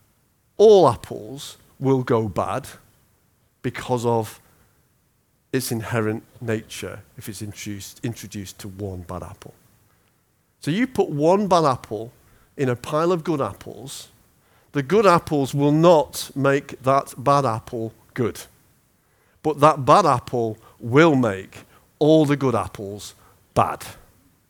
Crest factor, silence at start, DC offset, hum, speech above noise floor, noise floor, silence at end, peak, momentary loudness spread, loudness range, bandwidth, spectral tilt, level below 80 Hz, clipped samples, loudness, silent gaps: 22 dB; 0.6 s; under 0.1%; none; 44 dB; -65 dBFS; 0.55 s; 0 dBFS; 19 LU; 11 LU; over 20 kHz; -6 dB/octave; -56 dBFS; under 0.1%; -20 LUFS; none